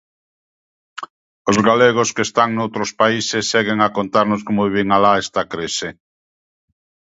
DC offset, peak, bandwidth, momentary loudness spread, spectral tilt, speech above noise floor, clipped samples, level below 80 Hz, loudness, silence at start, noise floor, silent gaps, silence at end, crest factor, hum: under 0.1%; 0 dBFS; 8 kHz; 16 LU; -4 dB/octave; over 73 dB; under 0.1%; -54 dBFS; -17 LUFS; 0.95 s; under -90 dBFS; 1.10-1.45 s; 1.2 s; 18 dB; none